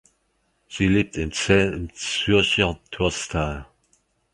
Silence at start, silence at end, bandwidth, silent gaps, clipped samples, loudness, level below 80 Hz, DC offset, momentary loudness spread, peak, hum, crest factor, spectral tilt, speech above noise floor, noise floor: 0.7 s; 0.7 s; 11.5 kHz; none; under 0.1%; -22 LUFS; -40 dBFS; under 0.1%; 10 LU; -4 dBFS; none; 20 dB; -4.5 dB/octave; 47 dB; -69 dBFS